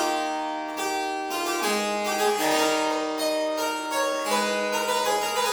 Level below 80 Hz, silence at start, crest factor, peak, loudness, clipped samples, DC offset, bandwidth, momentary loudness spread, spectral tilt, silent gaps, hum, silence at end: -66 dBFS; 0 s; 14 dB; -10 dBFS; -25 LUFS; under 0.1%; under 0.1%; over 20 kHz; 6 LU; -1.5 dB/octave; none; none; 0 s